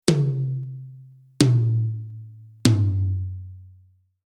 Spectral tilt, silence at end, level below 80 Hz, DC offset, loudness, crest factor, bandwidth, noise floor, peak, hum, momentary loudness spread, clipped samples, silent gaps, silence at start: -6 dB/octave; 0.6 s; -54 dBFS; under 0.1%; -23 LUFS; 22 dB; 13.5 kHz; -56 dBFS; -2 dBFS; none; 21 LU; under 0.1%; none; 0.05 s